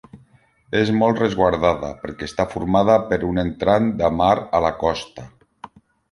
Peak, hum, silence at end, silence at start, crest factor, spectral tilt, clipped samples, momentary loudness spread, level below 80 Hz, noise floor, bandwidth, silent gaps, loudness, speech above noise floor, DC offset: -2 dBFS; none; 0.45 s; 0.15 s; 18 dB; -6.5 dB/octave; under 0.1%; 11 LU; -42 dBFS; -55 dBFS; 11.5 kHz; none; -19 LUFS; 36 dB; under 0.1%